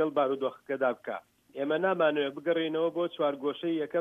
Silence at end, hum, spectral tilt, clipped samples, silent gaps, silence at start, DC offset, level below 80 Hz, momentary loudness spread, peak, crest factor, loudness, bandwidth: 0 s; none; -7 dB/octave; under 0.1%; none; 0 s; under 0.1%; -82 dBFS; 10 LU; -14 dBFS; 16 dB; -30 LUFS; 4 kHz